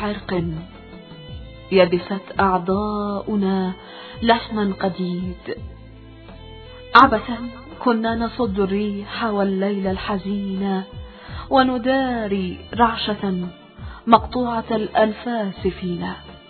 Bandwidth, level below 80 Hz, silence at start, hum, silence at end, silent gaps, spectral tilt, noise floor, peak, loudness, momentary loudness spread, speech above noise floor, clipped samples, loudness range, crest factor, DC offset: 6 kHz; -42 dBFS; 0 s; none; 0.1 s; none; -8.5 dB/octave; -41 dBFS; 0 dBFS; -21 LUFS; 21 LU; 21 dB; under 0.1%; 4 LU; 22 dB; under 0.1%